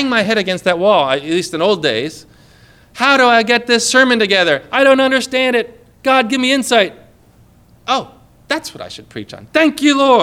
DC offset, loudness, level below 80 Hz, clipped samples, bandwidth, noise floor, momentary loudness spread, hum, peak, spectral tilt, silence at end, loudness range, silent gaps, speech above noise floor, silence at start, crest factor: under 0.1%; -13 LUFS; -54 dBFS; under 0.1%; 15.5 kHz; -47 dBFS; 14 LU; none; 0 dBFS; -3 dB/octave; 0 s; 7 LU; none; 34 dB; 0 s; 14 dB